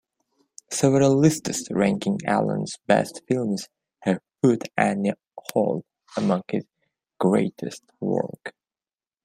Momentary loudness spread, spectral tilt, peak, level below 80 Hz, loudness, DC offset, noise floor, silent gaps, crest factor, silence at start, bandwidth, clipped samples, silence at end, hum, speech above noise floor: 13 LU; -6 dB/octave; -2 dBFS; -64 dBFS; -24 LUFS; under 0.1%; under -90 dBFS; none; 22 dB; 0.7 s; 16 kHz; under 0.1%; 0.75 s; none; over 67 dB